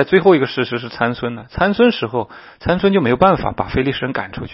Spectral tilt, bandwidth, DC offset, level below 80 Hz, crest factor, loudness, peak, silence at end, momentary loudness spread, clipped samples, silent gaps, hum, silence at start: -9.5 dB/octave; 5.8 kHz; under 0.1%; -40 dBFS; 16 dB; -17 LUFS; 0 dBFS; 0 s; 11 LU; under 0.1%; none; none; 0 s